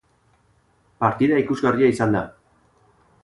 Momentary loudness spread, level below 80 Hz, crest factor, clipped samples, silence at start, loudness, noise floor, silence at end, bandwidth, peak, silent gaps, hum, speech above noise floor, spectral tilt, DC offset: 6 LU; -54 dBFS; 18 dB; under 0.1%; 1 s; -20 LUFS; -61 dBFS; 0.95 s; 11.5 kHz; -4 dBFS; none; none; 42 dB; -7.5 dB/octave; under 0.1%